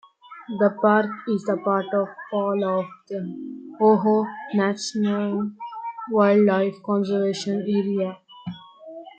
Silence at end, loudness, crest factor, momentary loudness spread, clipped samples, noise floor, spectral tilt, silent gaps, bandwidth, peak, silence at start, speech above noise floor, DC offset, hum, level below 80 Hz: 0.1 s; -23 LUFS; 18 dB; 18 LU; under 0.1%; -41 dBFS; -6.5 dB/octave; none; 8.8 kHz; -4 dBFS; 0.3 s; 19 dB; under 0.1%; none; -72 dBFS